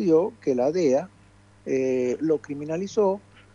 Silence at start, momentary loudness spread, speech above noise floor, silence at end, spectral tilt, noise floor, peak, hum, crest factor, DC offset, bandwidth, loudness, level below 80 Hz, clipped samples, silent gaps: 0 s; 9 LU; 31 dB; 0.35 s; -6.5 dB/octave; -54 dBFS; -8 dBFS; none; 16 dB; under 0.1%; 7.4 kHz; -25 LUFS; -64 dBFS; under 0.1%; none